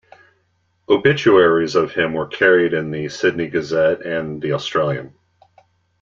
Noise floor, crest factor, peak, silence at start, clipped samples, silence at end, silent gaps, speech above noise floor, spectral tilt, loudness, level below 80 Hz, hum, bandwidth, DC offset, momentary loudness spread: -65 dBFS; 18 dB; -2 dBFS; 0.9 s; under 0.1%; 0.95 s; none; 48 dB; -6 dB/octave; -17 LUFS; -56 dBFS; none; 7.6 kHz; under 0.1%; 10 LU